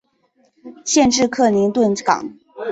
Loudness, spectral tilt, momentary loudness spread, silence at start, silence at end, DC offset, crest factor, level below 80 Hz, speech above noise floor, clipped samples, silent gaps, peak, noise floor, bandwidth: -16 LUFS; -3.5 dB/octave; 15 LU; 0.65 s; 0 s; under 0.1%; 18 dB; -52 dBFS; 45 dB; under 0.1%; none; 0 dBFS; -61 dBFS; 8.2 kHz